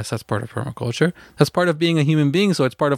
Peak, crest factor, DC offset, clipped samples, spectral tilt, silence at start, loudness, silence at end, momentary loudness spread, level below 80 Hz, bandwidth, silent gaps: -2 dBFS; 18 dB; under 0.1%; under 0.1%; -6 dB/octave; 0 s; -20 LUFS; 0 s; 9 LU; -56 dBFS; 15 kHz; none